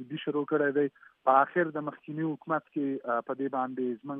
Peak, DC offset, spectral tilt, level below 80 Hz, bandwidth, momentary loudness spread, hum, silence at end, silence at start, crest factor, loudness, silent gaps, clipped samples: -8 dBFS; under 0.1%; -10 dB/octave; -88 dBFS; 3.8 kHz; 10 LU; none; 0 s; 0 s; 22 dB; -30 LUFS; none; under 0.1%